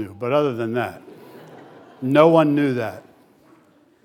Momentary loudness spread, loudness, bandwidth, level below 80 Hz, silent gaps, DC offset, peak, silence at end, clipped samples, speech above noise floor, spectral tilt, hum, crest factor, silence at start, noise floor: 16 LU; -19 LUFS; 16.5 kHz; -76 dBFS; none; under 0.1%; 0 dBFS; 1.05 s; under 0.1%; 37 dB; -8 dB/octave; none; 20 dB; 0 s; -55 dBFS